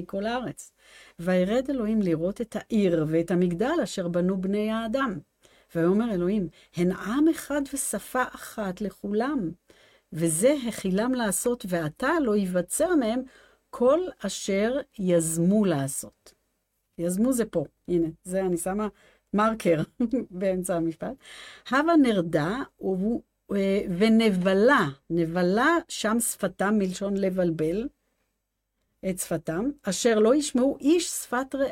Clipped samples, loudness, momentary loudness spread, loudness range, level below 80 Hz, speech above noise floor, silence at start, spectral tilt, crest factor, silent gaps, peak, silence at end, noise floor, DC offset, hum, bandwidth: under 0.1%; -26 LUFS; 10 LU; 5 LU; -56 dBFS; 54 dB; 0 s; -5 dB/octave; 16 dB; none; -10 dBFS; 0 s; -79 dBFS; under 0.1%; none; 16.5 kHz